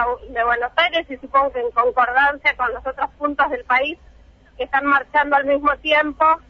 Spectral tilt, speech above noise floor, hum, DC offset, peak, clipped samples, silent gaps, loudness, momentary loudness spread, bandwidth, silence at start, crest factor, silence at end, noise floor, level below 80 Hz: -4.5 dB/octave; 29 dB; none; under 0.1%; -4 dBFS; under 0.1%; none; -18 LUFS; 8 LU; 7.2 kHz; 0 s; 14 dB; 0.1 s; -48 dBFS; -46 dBFS